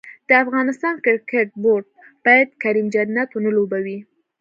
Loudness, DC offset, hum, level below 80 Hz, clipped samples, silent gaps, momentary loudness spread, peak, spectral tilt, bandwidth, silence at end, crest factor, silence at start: -18 LUFS; under 0.1%; none; -70 dBFS; under 0.1%; none; 8 LU; -2 dBFS; -6.5 dB/octave; 7.6 kHz; 0.4 s; 18 dB; 0.05 s